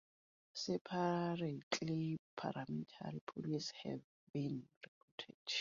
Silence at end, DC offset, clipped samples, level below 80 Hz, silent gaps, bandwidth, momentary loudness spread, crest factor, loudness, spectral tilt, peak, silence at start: 0 s; under 0.1%; under 0.1%; -80 dBFS; 0.81-0.85 s, 1.63-1.71 s, 2.19-2.37 s, 3.21-3.27 s, 4.04-4.34 s, 4.77-4.81 s, 4.88-5.18 s, 5.34-5.45 s; 7.4 kHz; 13 LU; 22 dB; -43 LUFS; -4.5 dB/octave; -22 dBFS; 0.55 s